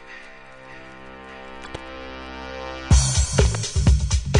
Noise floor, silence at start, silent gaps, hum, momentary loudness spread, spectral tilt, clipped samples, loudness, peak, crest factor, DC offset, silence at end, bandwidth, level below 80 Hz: -42 dBFS; 0 s; none; none; 22 LU; -4.5 dB/octave; under 0.1%; -21 LUFS; -4 dBFS; 20 dB; under 0.1%; 0 s; 11 kHz; -26 dBFS